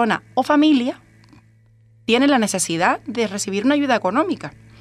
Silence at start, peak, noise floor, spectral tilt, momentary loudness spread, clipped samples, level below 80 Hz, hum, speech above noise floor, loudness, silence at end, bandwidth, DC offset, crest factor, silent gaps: 0 s; -2 dBFS; -53 dBFS; -3.5 dB/octave; 12 LU; under 0.1%; -60 dBFS; none; 34 dB; -19 LUFS; 0.3 s; 14 kHz; under 0.1%; 16 dB; none